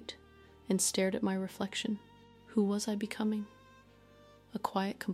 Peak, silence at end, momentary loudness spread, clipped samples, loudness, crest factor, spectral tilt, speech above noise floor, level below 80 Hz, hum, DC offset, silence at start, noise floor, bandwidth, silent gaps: -16 dBFS; 0 s; 16 LU; under 0.1%; -34 LUFS; 20 dB; -4 dB/octave; 26 dB; -70 dBFS; none; under 0.1%; 0 s; -60 dBFS; 16 kHz; none